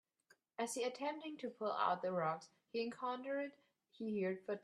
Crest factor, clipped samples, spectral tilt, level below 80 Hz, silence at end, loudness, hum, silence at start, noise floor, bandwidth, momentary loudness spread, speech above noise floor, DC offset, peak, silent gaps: 20 dB; under 0.1%; -4.5 dB/octave; under -90 dBFS; 0.05 s; -42 LUFS; none; 0.6 s; -75 dBFS; 12.5 kHz; 10 LU; 34 dB; under 0.1%; -24 dBFS; none